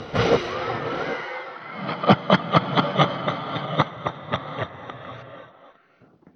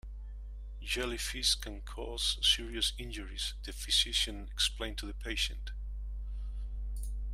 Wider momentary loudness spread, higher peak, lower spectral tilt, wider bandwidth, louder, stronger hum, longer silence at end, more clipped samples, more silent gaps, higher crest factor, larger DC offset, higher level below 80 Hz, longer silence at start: about the same, 18 LU vs 16 LU; first, -2 dBFS vs -16 dBFS; first, -6.5 dB/octave vs -2 dB/octave; second, 6.8 kHz vs 15.5 kHz; first, -24 LUFS vs -33 LUFS; second, none vs 50 Hz at -40 dBFS; first, 0.65 s vs 0 s; neither; neither; about the same, 24 dB vs 20 dB; neither; second, -54 dBFS vs -40 dBFS; about the same, 0 s vs 0.05 s